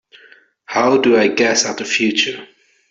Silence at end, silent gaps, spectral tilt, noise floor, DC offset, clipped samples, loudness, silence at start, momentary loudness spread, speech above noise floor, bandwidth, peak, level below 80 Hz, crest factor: 0.45 s; none; -2.5 dB/octave; -48 dBFS; under 0.1%; under 0.1%; -15 LUFS; 0.7 s; 8 LU; 33 dB; 8 kHz; -2 dBFS; -62 dBFS; 16 dB